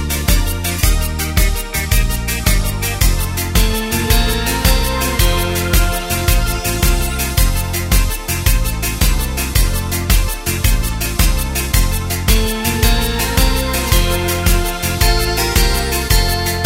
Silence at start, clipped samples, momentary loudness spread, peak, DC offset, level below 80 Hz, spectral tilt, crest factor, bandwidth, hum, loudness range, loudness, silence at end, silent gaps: 0 s; under 0.1%; 4 LU; 0 dBFS; under 0.1%; -16 dBFS; -3.5 dB/octave; 14 dB; 16.5 kHz; none; 2 LU; -16 LUFS; 0 s; none